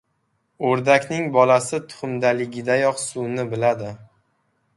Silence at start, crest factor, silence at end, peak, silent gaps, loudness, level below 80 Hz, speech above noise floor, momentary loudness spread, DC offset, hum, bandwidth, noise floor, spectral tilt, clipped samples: 0.6 s; 20 dB; 0.75 s; -2 dBFS; none; -21 LUFS; -64 dBFS; 50 dB; 11 LU; under 0.1%; none; 11.5 kHz; -70 dBFS; -5 dB/octave; under 0.1%